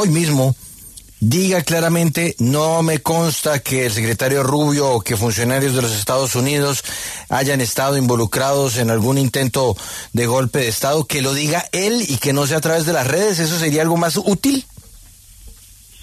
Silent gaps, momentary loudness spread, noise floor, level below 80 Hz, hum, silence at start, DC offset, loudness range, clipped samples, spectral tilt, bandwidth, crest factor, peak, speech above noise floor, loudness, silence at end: none; 4 LU; -43 dBFS; -48 dBFS; none; 0 s; under 0.1%; 1 LU; under 0.1%; -4.5 dB/octave; 14 kHz; 14 dB; -4 dBFS; 26 dB; -17 LUFS; 0.5 s